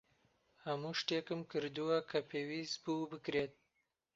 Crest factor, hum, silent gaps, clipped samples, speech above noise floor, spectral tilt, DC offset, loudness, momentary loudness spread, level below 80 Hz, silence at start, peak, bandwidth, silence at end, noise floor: 22 dB; none; none; under 0.1%; 44 dB; -3.5 dB/octave; under 0.1%; -40 LUFS; 6 LU; -78 dBFS; 0.65 s; -20 dBFS; 7.6 kHz; 0.65 s; -84 dBFS